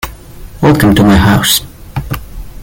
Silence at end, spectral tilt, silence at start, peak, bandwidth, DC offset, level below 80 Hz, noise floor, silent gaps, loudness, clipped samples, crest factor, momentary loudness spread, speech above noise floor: 0 s; -5 dB/octave; 0.05 s; 0 dBFS; 17 kHz; under 0.1%; -26 dBFS; -29 dBFS; none; -9 LUFS; under 0.1%; 10 dB; 17 LU; 22 dB